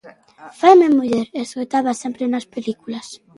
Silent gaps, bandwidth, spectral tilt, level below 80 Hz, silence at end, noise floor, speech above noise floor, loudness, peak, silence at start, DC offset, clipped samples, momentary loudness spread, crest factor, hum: none; 11.5 kHz; -5 dB/octave; -66 dBFS; 0.25 s; -42 dBFS; 25 dB; -17 LUFS; 0 dBFS; 0.05 s; under 0.1%; under 0.1%; 16 LU; 18 dB; none